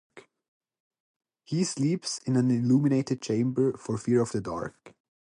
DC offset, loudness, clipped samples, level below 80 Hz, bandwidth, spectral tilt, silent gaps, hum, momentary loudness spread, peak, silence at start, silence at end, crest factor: under 0.1%; -27 LUFS; under 0.1%; -64 dBFS; 11 kHz; -6.5 dB/octave; 0.48-0.61 s, 0.80-0.91 s, 1.00-1.20 s; none; 10 LU; -12 dBFS; 0.15 s; 0.35 s; 16 dB